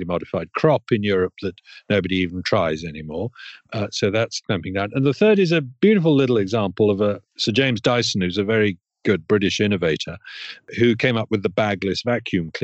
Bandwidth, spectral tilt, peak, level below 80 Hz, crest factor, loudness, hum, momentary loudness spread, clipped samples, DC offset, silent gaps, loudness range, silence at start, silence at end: 8.2 kHz; -5.5 dB/octave; -4 dBFS; -54 dBFS; 18 dB; -20 LUFS; none; 12 LU; under 0.1%; under 0.1%; none; 5 LU; 0 s; 0 s